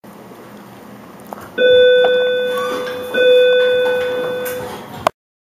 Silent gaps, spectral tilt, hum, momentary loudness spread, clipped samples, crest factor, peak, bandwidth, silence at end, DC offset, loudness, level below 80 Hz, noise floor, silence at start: none; -3.5 dB/octave; none; 16 LU; under 0.1%; 16 dB; 0 dBFS; 15.5 kHz; 0.4 s; under 0.1%; -15 LUFS; -58 dBFS; -37 dBFS; 0.05 s